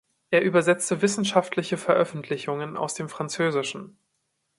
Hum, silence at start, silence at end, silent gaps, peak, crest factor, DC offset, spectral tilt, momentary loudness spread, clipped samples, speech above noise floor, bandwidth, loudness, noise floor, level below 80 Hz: none; 0.3 s; 0.7 s; none; -4 dBFS; 22 dB; under 0.1%; -4.5 dB/octave; 10 LU; under 0.1%; 51 dB; 11.5 kHz; -25 LUFS; -76 dBFS; -70 dBFS